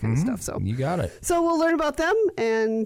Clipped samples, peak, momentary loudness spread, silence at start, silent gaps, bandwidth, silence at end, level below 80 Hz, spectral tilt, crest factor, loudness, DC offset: under 0.1%; -14 dBFS; 6 LU; 0 s; none; 16 kHz; 0 s; -46 dBFS; -6 dB/octave; 10 dB; -24 LUFS; under 0.1%